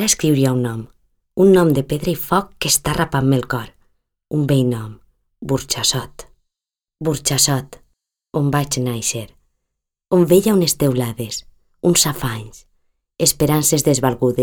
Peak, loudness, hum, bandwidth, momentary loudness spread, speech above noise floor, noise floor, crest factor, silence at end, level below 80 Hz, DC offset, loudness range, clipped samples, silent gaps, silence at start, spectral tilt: -2 dBFS; -17 LUFS; none; over 20 kHz; 13 LU; 70 dB; -87 dBFS; 16 dB; 0 s; -44 dBFS; under 0.1%; 4 LU; under 0.1%; none; 0 s; -4.5 dB/octave